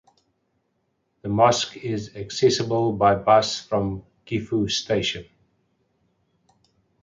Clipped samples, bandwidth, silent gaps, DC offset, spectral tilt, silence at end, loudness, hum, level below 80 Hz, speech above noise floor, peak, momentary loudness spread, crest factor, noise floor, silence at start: under 0.1%; 9.4 kHz; none; under 0.1%; -4.5 dB/octave; 1.8 s; -22 LUFS; none; -52 dBFS; 51 dB; -4 dBFS; 12 LU; 20 dB; -72 dBFS; 1.25 s